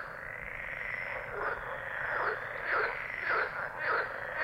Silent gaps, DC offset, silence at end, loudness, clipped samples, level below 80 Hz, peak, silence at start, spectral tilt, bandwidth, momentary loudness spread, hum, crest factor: none; under 0.1%; 0 s; -34 LUFS; under 0.1%; -58 dBFS; -18 dBFS; 0 s; -5 dB/octave; 16.5 kHz; 7 LU; none; 18 dB